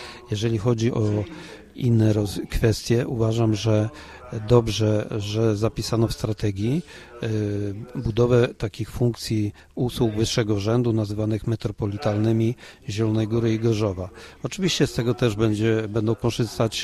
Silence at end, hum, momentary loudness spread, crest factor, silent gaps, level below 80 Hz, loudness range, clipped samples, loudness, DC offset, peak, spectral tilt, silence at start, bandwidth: 0 s; none; 10 LU; 18 dB; none; -42 dBFS; 2 LU; under 0.1%; -23 LUFS; under 0.1%; -4 dBFS; -6.5 dB/octave; 0 s; 13 kHz